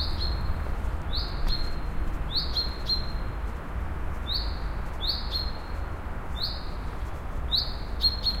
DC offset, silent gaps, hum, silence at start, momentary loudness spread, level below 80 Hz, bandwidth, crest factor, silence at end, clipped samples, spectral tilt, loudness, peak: under 0.1%; none; none; 0 s; 10 LU; -32 dBFS; 15.5 kHz; 16 dB; 0 s; under 0.1%; -5 dB/octave; -30 LUFS; -12 dBFS